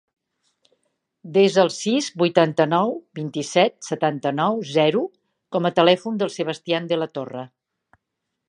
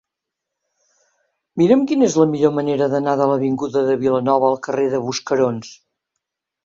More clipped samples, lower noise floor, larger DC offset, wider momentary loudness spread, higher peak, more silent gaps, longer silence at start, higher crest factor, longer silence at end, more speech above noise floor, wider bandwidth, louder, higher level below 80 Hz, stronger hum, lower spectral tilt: neither; about the same, -80 dBFS vs -82 dBFS; neither; first, 12 LU vs 6 LU; about the same, -2 dBFS vs -2 dBFS; neither; second, 1.25 s vs 1.55 s; about the same, 20 dB vs 18 dB; about the same, 1 s vs 0.9 s; second, 60 dB vs 65 dB; first, 11.5 kHz vs 7.8 kHz; second, -21 LUFS vs -18 LUFS; second, -74 dBFS vs -60 dBFS; neither; about the same, -5 dB/octave vs -6 dB/octave